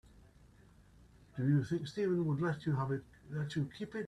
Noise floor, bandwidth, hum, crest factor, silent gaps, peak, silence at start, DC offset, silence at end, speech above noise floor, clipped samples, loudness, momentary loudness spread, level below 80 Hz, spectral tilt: -62 dBFS; 10 kHz; none; 16 dB; none; -20 dBFS; 1.35 s; under 0.1%; 0 s; 27 dB; under 0.1%; -36 LUFS; 9 LU; -66 dBFS; -8 dB/octave